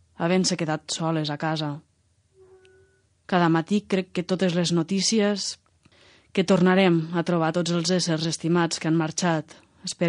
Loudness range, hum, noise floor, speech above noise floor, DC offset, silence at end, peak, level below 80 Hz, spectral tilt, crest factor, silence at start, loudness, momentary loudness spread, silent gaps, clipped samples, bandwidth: 5 LU; none; -64 dBFS; 41 dB; under 0.1%; 0 s; -8 dBFS; -68 dBFS; -5 dB/octave; 18 dB; 0.2 s; -24 LUFS; 9 LU; none; under 0.1%; 10.5 kHz